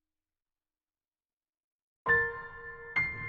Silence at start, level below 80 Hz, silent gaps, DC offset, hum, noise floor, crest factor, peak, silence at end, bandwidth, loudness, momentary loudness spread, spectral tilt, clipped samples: 2.05 s; -60 dBFS; none; under 0.1%; none; under -90 dBFS; 20 dB; -16 dBFS; 0 s; 6.8 kHz; -30 LUFS; 17 LU; -6.5 dB/octave; under 0.1%